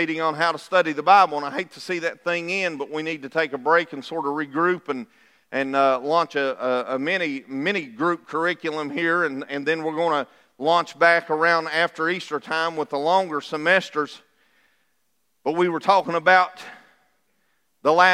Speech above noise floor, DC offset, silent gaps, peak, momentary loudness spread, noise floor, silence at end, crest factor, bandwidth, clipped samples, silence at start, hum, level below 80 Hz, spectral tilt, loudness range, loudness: 51 dB; under 0.1%; none; -2 dBFS; 11 LU; -73 dBFS; 0 s; 20 dB; 13 kHz; under 0.1%; 0 s; none; -82 dBFS; -4.5 dB/octave; 3 LU; -22 LUFS